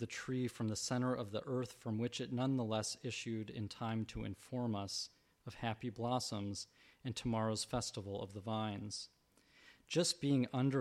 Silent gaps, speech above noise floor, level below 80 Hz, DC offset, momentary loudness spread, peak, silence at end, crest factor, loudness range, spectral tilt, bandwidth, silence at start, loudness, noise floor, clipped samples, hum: none; 29 dB; -66 dBFS; under 0.1%; 10 LU; -22 dBFS; 0 s; 18 dB; 3 LU; -5 dB/octave; 13.5 kHz; 0 s; -40 LUFS; -69 dBFS; under 0.1%; none